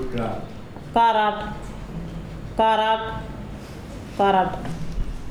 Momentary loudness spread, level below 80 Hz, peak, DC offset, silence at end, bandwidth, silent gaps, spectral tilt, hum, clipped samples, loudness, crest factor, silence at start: 18 LU; -36 dBFS; -8 dBFS; under 0.1%; 0 s; 13 kHz; none; -6 dB/octave; none; under 0.1%; -23 LUFS; 16 dB; 0 s